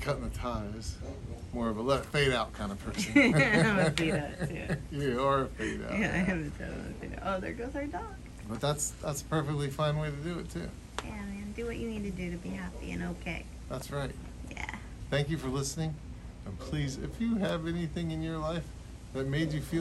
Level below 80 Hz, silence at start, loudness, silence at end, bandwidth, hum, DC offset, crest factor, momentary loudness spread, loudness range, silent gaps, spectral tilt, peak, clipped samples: -46 dBFS; 0 s; -33 LUFS; 0 s; 13 kHz; none; under 0.1%; 24 dB; 13 LU; 10 LU; none; -5.5 dB/octave; -10 dBFS; under 0.1%